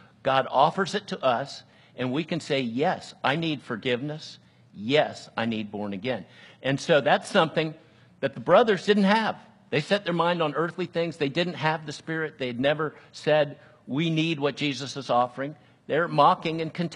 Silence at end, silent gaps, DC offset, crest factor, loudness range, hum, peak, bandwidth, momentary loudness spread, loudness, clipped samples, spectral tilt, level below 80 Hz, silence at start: 0 s; none; under 0.1%; 22 dB; 5 LU; none; -4 dBFS; 11.5 kHz; 12 LU; -26 LUFS; under 0.1%; -5.5 dB/octave; -70 dBFS; 0.25 s